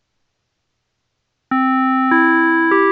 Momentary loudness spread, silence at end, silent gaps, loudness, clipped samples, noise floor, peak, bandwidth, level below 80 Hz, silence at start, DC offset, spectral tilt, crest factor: 5 LU; 0 s; none; -14 LUFS; under 0.1%; -71 dBFS; -2 dBFS; 4.7 kHz; -74 dBFS; 1.5 s; under 0.1%; -7 dB/octave; 16 dB